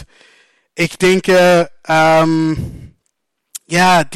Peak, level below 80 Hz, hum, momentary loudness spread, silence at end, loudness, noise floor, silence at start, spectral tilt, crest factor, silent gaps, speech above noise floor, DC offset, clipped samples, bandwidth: -4 dBFS; -44 dBFS; none; 20 LU; 0 s; -13 LUFS; -70 dBFS; 0 s; -5 dB/octave; 10 dB; none; 58 dB; under 0.1%; under 0.1%; 16 kHz